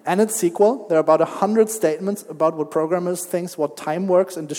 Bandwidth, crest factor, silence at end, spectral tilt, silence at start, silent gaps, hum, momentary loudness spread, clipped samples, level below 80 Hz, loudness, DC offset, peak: 18 kHz; 16 dB; 0 s; -5.5 dB/octave; 0.05 s; none; none; 8 LU; under 0.1%; -76 dBFS; -20 LUFS; under 0.1%; -2 dBFS